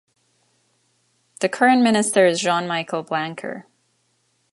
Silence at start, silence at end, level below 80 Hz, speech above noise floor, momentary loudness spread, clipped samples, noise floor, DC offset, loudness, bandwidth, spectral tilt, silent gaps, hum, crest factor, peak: 1.4 s; 0.9 s; -72 dBFS; 48 dB; 15 LU; under 0.1%; -67 dBFS; under 0.1%; -19 LUFS; 11.5 kHz; -3.5 dB/octave; none; none; 20 dB; -2 dBFS